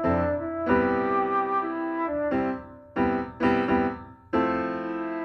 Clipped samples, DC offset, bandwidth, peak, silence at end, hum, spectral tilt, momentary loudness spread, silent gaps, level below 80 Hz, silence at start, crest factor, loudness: under 0.1%; under 0.1%; 6.2 kHz; -8 dBFS; 0 s; none; -8.5 dB/octave; 7 LU; none; -50 dBFS; 0 s; 18 dB; -26 LUFS